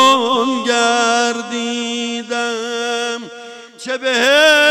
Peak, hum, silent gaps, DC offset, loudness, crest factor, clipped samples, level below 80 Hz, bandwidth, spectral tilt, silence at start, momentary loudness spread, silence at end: -2 dBFS; none; none; under 0.1%; -15 LUFS; 14 dB; under 0.1%; -68 dBFS; 16 kHz; -1 dB/octave; 0 s; 16 LU; 0 s